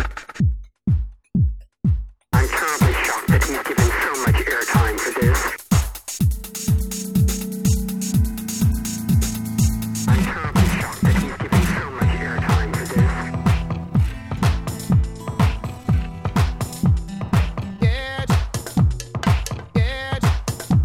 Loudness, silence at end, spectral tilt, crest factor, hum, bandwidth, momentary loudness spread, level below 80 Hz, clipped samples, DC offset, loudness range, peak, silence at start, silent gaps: -21 LUFS; 0 s; -5.5 dB/octave; 16 dB; none; 19.5 kHz; 5 LU; -26 dBFS; under 0.1%; under 0.1%; 3 LU; -4 dBFS; 0 s; none